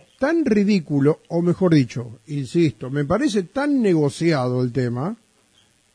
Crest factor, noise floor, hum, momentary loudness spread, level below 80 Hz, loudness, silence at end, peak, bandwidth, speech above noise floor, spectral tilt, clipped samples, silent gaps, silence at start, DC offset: 16 dB; -59 dBFS; none; 10 LU; -54 dBFS; -20 LUFS; 0.8 s; -4 dBFS; 10.5 kHz; 39 dB; -7.5 dB/octave; under 0.1%; none; 0.2 s; under 0.1%